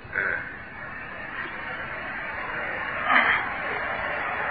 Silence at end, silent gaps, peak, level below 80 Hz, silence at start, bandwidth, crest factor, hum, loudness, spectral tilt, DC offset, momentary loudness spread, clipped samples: 0 s; none; -6 dBFS; -54 dBFS; 0 s; 5 kHz; 24 dB; none; -27 LUFS; -8 dB/octave; 0.2%; 15 LU; under 0.1%